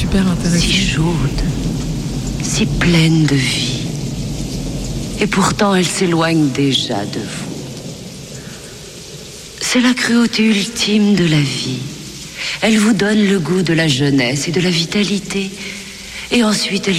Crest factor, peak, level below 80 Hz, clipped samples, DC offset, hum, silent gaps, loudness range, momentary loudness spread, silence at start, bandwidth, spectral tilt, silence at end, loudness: 12 dB; -4 dBFS; -32 dBFS; under 0.1%; under 0.1%; none; none; 4 LU; 16 LU; 0 s; 15.5 kHz; -4.5 dB/octave; 0 s; -15 LUFS